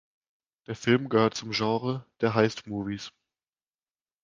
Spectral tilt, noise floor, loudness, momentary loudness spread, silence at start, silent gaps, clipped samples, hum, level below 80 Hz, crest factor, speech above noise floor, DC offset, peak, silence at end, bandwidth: -5.5 dB/octave; under -90 dBFS; -27 LUFS; 12 LU; 0.7 s; none; under 0.1%; none; -62 dBFS; 22 dB; over 63 dB; under 0.1%; -6 dBFS; 1.15 s; 7.6 kHz